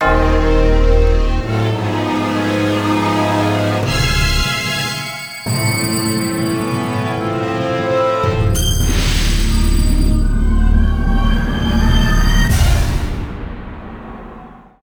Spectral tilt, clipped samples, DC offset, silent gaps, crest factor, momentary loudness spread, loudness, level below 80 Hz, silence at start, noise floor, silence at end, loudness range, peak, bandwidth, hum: -5 dB/octave; under 0.1%; under 0.1%; none; 12 dB; 10 LU; -16 LUFS; -18 dBFS; 0 s; -37 dBFS; 0.25 s; 2 LU; -2 dBFS; over 20 kHz; none